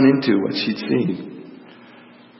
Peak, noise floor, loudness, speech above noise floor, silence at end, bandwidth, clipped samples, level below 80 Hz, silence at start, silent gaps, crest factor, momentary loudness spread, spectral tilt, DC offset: -2 dBFS; -46 dBFS; -20 LUFS; 27 dB; 0.85 s; 5.8 kHz; under 0.1%; -68 dBFS; 0 s; none; 18 dB; 21 LU; -10 dB/octave; under 0.1%